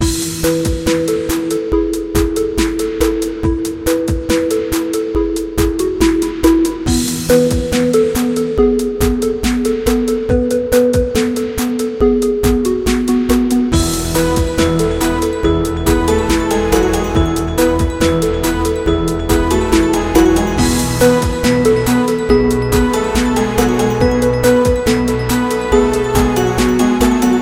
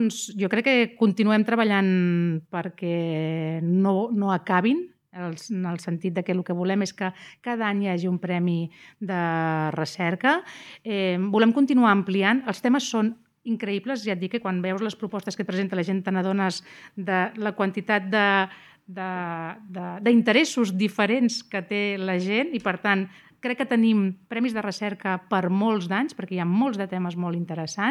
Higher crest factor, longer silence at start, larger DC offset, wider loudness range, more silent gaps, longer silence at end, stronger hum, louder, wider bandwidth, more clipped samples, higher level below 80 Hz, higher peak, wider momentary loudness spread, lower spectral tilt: about the same, 14 dB vs 18 dB; about the same, 0 s vs 0 s; first, 0.2% vs under 0.1%; about the same, 3 LU vs 4 LU; neither; about the same, 0 s vs 0 s; neither; first, -14 LUFS vs -24 LUFS; first, 17 kHz vs 12 kHz; neither; first, -24 dBFS vs -78 dBFS; first, 0 dBFS vs -6 dBFS; second, 4 LU vs 11 LU; about the same, -5.5 dB/octave vs -6 dB/octave